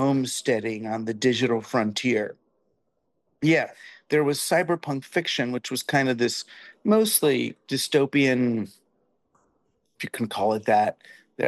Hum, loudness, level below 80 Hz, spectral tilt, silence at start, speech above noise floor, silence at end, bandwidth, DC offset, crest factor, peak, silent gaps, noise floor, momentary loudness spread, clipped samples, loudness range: none; -24 LUFS; -72 dBFS; -4.5 dB/octave; 0 s; 51 dB; 0 s; 12.5 kHz; under 0.1%; 18 dB; -8 dBFS; none; -75 dBFS; 10 LU; under 0.1%; 3 LU